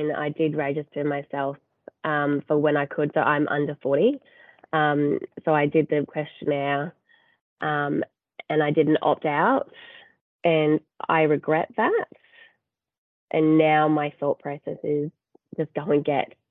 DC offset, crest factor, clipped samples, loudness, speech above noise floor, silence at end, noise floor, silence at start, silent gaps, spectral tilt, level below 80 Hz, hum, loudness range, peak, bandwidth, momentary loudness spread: under 0.1%; 18 dB; under 0.1%; -24 LUFS; 50 dB; 0.25 s; -74 dBFS; 0 s; 7.41-7.56 s, 10.21-10.39 s, 12.98-13.27 s; -10 dB/octave; -72 dBFS; none; 2 LU; -6 dBFS; 4 kHz; 10 LU